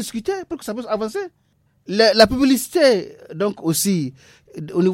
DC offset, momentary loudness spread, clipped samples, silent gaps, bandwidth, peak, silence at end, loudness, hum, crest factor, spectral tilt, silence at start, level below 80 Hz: under 0.1%; 16 LU; under 0.1%; none; 16.5 kHz; 0 dBFS; 0 s; -19 LUFS; none; 20 dB; -4 dB/octave; 0 s; -48 dBFS